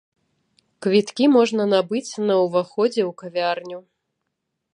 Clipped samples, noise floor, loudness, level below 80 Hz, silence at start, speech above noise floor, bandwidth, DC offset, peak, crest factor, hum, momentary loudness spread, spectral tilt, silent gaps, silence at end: under 0.1%; -78 dBFS; -20 LUFS; -74 dBFS; 0.8 s; 58 dB; 10.5 kHz; under 0.1%; -4 dBFS; 18 dB; none; 11 LU; -5.5 dB/octave; none; 0.95 s